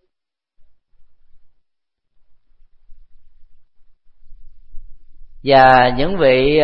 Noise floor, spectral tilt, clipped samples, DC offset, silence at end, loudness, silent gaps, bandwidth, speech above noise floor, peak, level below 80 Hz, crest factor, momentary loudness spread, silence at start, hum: -81 dBFS; -8 dB/octave; under 0.1%; under 0.1%; 0 s; -12 LUFS; none; 5.8 kHz; 70 dB; 0 dBFS; -36 dBFS; 18 dB; 7 LU; 1 s; none